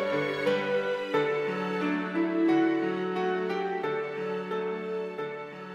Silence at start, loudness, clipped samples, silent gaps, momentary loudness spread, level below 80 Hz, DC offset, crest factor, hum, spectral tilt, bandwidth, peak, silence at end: 0 s; -29 LUFS; under 0.1%; none; 8 LU; -78 dBFS; under 0.1%; 14 dB; none; -6.5 dB/octave; 9.6 kHz; -14 dBFS; 0 s